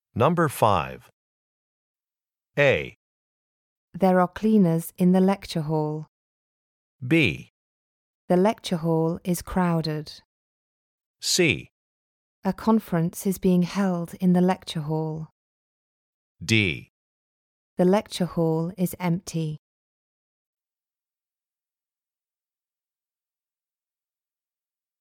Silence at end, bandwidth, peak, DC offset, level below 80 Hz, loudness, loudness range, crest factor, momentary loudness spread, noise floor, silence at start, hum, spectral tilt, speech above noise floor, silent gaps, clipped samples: 5.45 s; 17 kHz; -4 dBFS; under 0.1%; -56 dBFS; -24 LUFS; 6 LU; 22 dB; 13 LU; under -90 dBFS; 0.15 s; none; -5.5 dB/octave; over 67 dB; 1.13-1.95 s, 2.96-3.88 s, 6.08-6.99 s, 7.50-8.28 s, 10.25-11.14 s, 11.71-12.42 s, 15.31-16.35 s, 16.90-17.77 s; under 0.1%